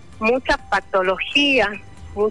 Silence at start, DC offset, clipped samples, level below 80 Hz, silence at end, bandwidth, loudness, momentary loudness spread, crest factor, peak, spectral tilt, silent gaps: 0.1 s; 0.8%; under 0.1%; -42 dBFS; 0 s; 11.5 kHz; -19 LUFS; 9 LU; 14 dB; -6 dBFS; -4 dB/octave; none